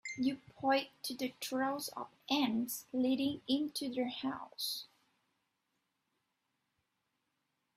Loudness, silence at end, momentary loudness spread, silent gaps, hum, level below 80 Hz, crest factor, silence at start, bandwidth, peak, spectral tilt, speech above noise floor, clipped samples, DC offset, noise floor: -37 LUFS; 2.9 s; 8 LU; none; none; -78 dBFS; 20 dB; 0.05 s; 16 kHz; -18 dBFS; -3 dB/octave; 47 dB; under 0.1%; under 0.1%; -84 dBFS